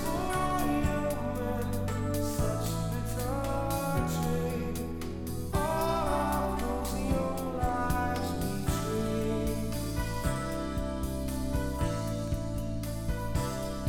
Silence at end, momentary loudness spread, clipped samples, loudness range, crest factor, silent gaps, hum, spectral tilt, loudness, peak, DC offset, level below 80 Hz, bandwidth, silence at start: 0 s; 5 LU; under 0.1%; 3 LU; 16 dB; none; none; -6 dB/octave; -32 LUFS; -16 dBFS; 0.2%; -38 dBFS; 19 kHz; 0 s